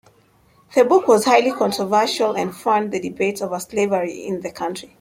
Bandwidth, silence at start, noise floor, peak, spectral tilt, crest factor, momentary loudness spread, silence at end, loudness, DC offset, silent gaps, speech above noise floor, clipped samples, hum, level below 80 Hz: 16.5 kHz; 0.7 s; -56 dBFS; -2 dBFS; -4 dB/octave; 18 dB; 13 LU; 0.15 s; -19 LUFS; under 0.1%; none; 37 dB; under 0.1%; none; -62 dBFS